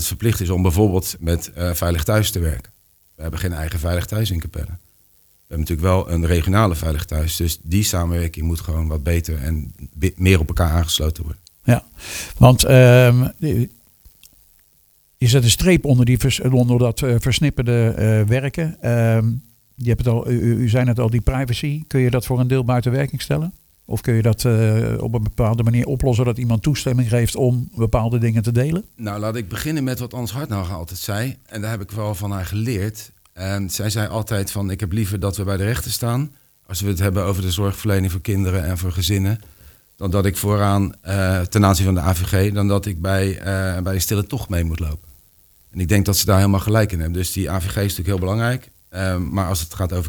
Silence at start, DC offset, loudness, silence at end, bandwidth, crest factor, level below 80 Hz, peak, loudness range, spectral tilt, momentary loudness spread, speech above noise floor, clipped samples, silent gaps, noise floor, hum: 0 s; under 0.1%; -19 LUFS; 0 s; over 20 kHz; 18 dB; -32 dBFS; 0 dBFS; 8 LU; -5.5 dB/octave; 11 LU; 39 dB; under 0.1%; none; -57 dBFS; none